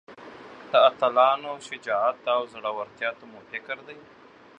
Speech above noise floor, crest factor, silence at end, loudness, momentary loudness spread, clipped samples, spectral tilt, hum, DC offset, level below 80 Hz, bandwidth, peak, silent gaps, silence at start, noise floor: 19 dB; 22 dB; 0.6 s; -25 LUFS; 24 LU; under 0.1%; -3 dB/octave; none; under 0.1%; -76 dBFS; 9.2 kHz; -4 dBFS; none; 0.1 s; -44 dBFS